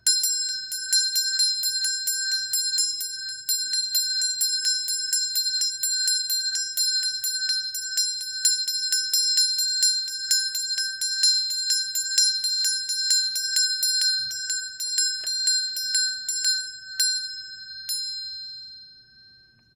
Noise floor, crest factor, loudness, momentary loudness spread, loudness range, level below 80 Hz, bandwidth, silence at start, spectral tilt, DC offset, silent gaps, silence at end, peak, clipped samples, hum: -55 dBFS; 20 dB; -22 LUFS; 8 LU; 3 LU; -72 dBFS; 18 kHz; 0.05 s; 5.5 dB/octave; under 0.1%; none; 0.75 s; -6 dBFS; under 0.1%; none